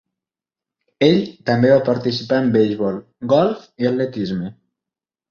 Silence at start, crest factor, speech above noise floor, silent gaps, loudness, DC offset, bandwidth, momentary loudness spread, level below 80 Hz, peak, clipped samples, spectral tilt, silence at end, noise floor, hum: 1 s; 18 dB; 71 dB; none; -18 LUFS; under 0.1%; 7 kHz; 10 LU; -56 dBFS; -2 dBFS; under 0.1%; -7.5 dB/octave; 0.8 s; -89 dBFS; none